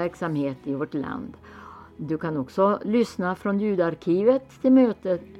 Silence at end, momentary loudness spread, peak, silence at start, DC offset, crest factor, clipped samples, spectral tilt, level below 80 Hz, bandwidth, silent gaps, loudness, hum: 0 s; 19 LU; -8 dBFS; 0 s; under 0.1%; 16 dB; under 0.1%; -8 dB/octave; -60 dBFS; 9.2 kHz; none; -24 LUFS; none